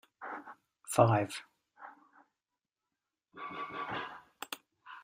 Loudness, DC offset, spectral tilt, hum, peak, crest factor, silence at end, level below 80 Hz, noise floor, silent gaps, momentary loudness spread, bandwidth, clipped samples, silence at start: -35 LUFS; under 0.1%; -5.5 dB/octave; none; -10 dBFS; 26 dB; 0 s; -72 dBFS; under -90 dBFS; none; 26 LU; 15.5 kHz; under 0.1%; 0.2 s